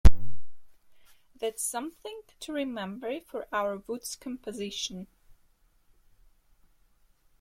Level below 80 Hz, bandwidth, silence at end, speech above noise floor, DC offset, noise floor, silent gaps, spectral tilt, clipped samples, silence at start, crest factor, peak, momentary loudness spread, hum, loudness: -34 dBFS; 16 kHz; 2.35 s; 29 dB; under 0.1%; -64 dBFS; none; -4.5 dB/octave; under 0.1%; 0.05 s; 22 dB; -4 dBFS; 12 LU; none; -34 LUFS